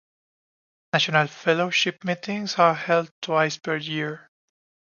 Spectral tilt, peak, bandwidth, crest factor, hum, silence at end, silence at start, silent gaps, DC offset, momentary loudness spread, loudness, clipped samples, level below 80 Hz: -4 dB/octave; -4 dBFS; 7.2 kHz; 22 dB; none; 0.75 s; 0.95 s; 3.11-3.22 s; under 0.1%; 9 LU; -23 LUFS; under 0.1%; -74 dBFS